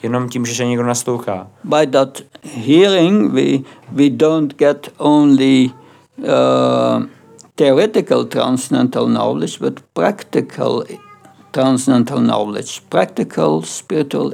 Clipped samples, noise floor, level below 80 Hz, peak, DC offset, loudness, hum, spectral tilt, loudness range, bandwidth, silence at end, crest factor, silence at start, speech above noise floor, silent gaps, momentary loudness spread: under 0.1%; -43 dBFS; -72 dBFS; -2 dBFS; under 0.1%; -15 LUFS; none; -5.5 dB/octave; 4 LU; 15 kHz; 0 s; 14 dB; 0.05 s; 29 dB; none; 11 LU